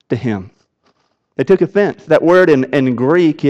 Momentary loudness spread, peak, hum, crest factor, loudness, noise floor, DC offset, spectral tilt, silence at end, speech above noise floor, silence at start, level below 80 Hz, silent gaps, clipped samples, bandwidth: 12 LU; -2 dBFS; none; 12 dB; -13 LUFS; -61 dBFS; under 0.1%; -8 dB/octave; 0 s; 48 dB; 0.1 s; -56 dBFS; none; under 0.1%; 8 kHz